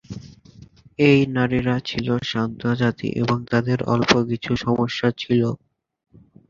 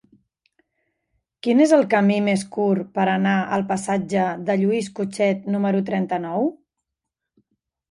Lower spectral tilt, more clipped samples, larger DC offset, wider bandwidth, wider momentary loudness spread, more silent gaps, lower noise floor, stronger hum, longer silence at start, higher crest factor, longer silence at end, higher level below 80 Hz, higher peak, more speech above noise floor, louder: about the same, -6.5 dB/octave vs -6.5 dB/octave; neither; neither; second, 7.4 kHz vs 11.5 kHz; about the same, 8 LU vs 8 LU; neither; second, -47 dBFS vs -83 dBFS; neither; second, 0.1 s vs 1.45 s; about the same, 20 dB vs 18 dB; second, 0.95 s vs 1.4 s; first, -50 dBFS vs -66 dBFS; about the same, -2 dBFS vs -4 dBFS; second, 27 dB vs 63 dB; about the same, -21 LUFS vs -21 LUFS